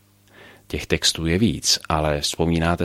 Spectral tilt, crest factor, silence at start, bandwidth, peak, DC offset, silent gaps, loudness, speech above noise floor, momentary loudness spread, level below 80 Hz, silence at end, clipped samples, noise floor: -4 dB/octave; 20 dB; 0.4 s; 16 kHz; -2 dBFS; under 0.1%; none; -20 LUFS; 29 dB; 6 LU; -38 dBFS; 0 s; under 0.1%; -49 dBFS